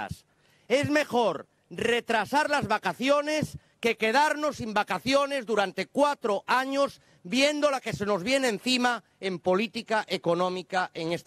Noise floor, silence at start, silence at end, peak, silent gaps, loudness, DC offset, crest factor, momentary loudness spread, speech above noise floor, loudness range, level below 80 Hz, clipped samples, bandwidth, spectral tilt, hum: -63 dBFS; 0 s; 0.05 s; -10 dBFS; none; -27 LUFS; under 0.1%; 18 dB; 7 LU; 36 dB; 1 LU; -64 dBFS; under 0.1%; 14.5 kHz; -4 dB/octave; none